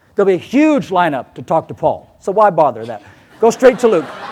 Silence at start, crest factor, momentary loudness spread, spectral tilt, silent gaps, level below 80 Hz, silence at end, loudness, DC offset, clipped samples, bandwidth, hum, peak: 0.2 s; 14 dB; 13 LU; -6 dB/octave; none; -54 dBFS; 0 s; -14 LUFS; under 0.1%; under 0.1%; 14 kHz; none; 0 dBFS